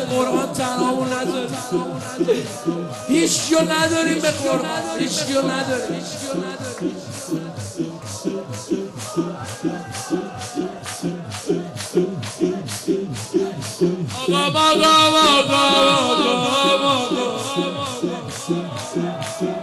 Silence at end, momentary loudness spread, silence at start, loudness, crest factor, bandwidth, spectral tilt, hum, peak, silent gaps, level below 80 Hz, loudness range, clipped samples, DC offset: 0 s; 13 LU; 0 s; -20 LUFS; 16 dB; 12.5 kHz; -3.5 dB/octave; none; -4 dBFS; none; -58 dBFS; 12 LU; under 0.1%; under 0.1%